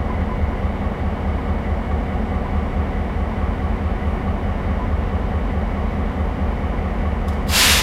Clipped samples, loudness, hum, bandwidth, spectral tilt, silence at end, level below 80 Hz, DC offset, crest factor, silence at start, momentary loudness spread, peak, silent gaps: under 0.1%; -22 LUFS; none; 16 kHz; -4.5 dB/octave; 0 s; -22 dBFS; under 0.1%; 20 dB; 0 s; 1 LU; 0 dBFS; none